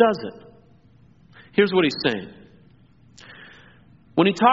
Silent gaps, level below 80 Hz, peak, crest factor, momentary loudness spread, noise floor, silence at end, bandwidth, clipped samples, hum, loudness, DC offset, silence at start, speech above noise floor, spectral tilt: none; -62 dBFS; -2 dBFS; 22 dB; 25 LU; -54 dBFS; 0 s; 7.4 kHz; under 0.1%; none; -21 LUFS; under 0.1%; 0 s; 34 dB; -3.5 dB/octave